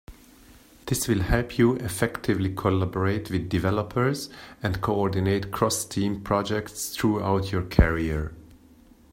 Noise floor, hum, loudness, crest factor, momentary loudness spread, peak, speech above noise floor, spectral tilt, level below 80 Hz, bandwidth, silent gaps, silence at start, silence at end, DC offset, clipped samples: -53 dBFS; none; -26 LUFS; 24 dB; 7 LU; -2 dBFS; 29 dB; -5.5 dB/octave; -36 dBFS; 16 kHz; none; 0.1 s; 0.6 s; under 0.1%; under 0.1%